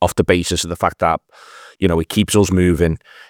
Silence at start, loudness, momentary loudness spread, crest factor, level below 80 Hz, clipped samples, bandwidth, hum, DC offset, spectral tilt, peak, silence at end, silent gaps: 0 s; -17 LUFS; 5 LU; 16 dB; -38 dBFS; under 0.1%; 19.5 kHz; none; under 0.1%; -5 dB/octave; 0 dBFS; 0.3 s; none